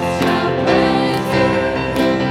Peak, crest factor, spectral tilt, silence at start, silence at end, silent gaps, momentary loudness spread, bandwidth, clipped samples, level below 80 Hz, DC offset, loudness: -2 dBFS; 14 dB; -6 dB/octave; 0 s; 0 s; none; 3 LU; 16.5 kHz; under 0.1%; -38 dBFS; under 0.1%; -16 LUFS